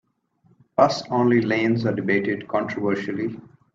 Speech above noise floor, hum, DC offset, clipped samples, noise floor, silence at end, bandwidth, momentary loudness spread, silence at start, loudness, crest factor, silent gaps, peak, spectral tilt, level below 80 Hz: 40 dB; none; under 0.1%; under 0.1%; -62 dBFS; 0.35 s; 7.6 kHz; 9 LU; 0.8 s; -22 LUFS; 20 dB; none; -2 dBFS; -6.5 dB/octave; -64 dBFS